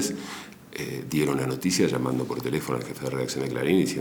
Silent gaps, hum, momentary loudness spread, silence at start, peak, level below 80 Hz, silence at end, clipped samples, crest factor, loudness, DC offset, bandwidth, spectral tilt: none; none; 12 LU; 0 s; -8 dBFS; -58 dBFS; 0 s; under 0.1%; 18 dB; -27 LUFS; under 0.1%; over 20 kHz; -5 dB/octave